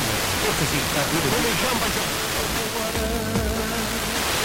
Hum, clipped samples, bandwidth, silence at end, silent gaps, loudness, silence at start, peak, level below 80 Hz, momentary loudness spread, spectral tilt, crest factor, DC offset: none; under 0.1%; 17 kHz; 0 s; none; -22 LUFS; 0 s; -10 dBFS; -36 dBFS; 4 LU; -3 dB/octave; 14 dB; under 0.1%